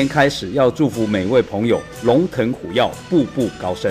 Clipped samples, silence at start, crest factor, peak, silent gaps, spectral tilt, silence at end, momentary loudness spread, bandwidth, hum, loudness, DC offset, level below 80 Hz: under 0.1%; 0 s; 14 dB; -4 dBFS; none; -6 dB/octave; 0 s; 5 LU; 15.5 kHz; none; -18 LUFS; under 0.1%; -46 dBFS